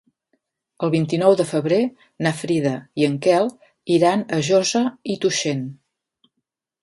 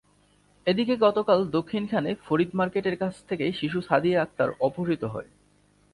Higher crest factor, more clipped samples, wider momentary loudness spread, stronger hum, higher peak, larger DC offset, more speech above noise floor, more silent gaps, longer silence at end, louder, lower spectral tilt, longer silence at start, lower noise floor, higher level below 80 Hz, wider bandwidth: about the same, 18 dB vs 20 dB; neither; about the same, 9 LU vs 8 LU; neither; first, -2 dBFS vs -6 dBFS; neither; first, 59 dB vs 37 dB; neither; first, 1.1 s vs 0.7 s; first, -20 LUFS vs -26 LUFS; second, -5 dB/octave vs -7.5 dB/octave; first, 0.8 s vs 0.65 s; first, -79 dBFS vs -62 dBFS; about the same, -66 dBFS vs -62 dBFS; about the same, 11.5 kHz vs 11.5 kHz